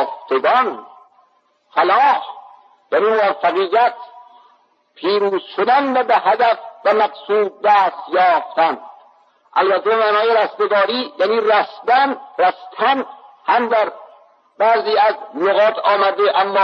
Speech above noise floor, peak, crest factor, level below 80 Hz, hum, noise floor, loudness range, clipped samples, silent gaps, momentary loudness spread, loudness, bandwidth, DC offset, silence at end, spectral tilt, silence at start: 43 dB; -4 dBFS; 14 dB; -82 dBFS; none; -59 dBFS; 2 LU; under 0.1%; none; 6 LU; -16 LUFS; 6.2 kHz; under 0.1%; 0 s; -5 dB/octave; 0 s